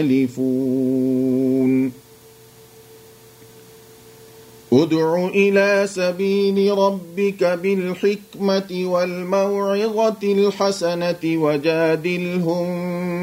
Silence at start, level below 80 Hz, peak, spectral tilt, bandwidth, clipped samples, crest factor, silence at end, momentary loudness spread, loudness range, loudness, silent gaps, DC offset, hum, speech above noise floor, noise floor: 0 s; -64 dBFS; -2 dBFS; -6.5 dB/octave; 16 kHz; under 0.1%; 16 dB; 0 s; 5 LU; 6 LU; -19 LUFS; none; under 0.1%; none; 28 dB; -46 dBFS